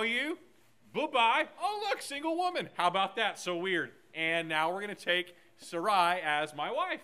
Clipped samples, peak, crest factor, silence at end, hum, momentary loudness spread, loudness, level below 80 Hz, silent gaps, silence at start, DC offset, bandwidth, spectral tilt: under 0.1%; -12 dBFS; 20 dB; 0 s; none; 9 LU; -31 LUFS; -86 dBFS; none; 0 s; under 0.1%; 15.5 kHz; -3 dB/octave